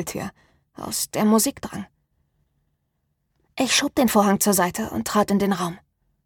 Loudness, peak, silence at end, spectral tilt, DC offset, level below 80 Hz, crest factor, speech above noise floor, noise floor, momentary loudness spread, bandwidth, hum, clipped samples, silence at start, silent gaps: -21 LUFS; -6 dBFS; 0.5 s; -3.5 dB/octave; under 0.1%; -54 dBFS; 18 dB; 51 dB; -73 dBFS; 17 LU; 19 kHz; none; under 0.1%; 0 s; none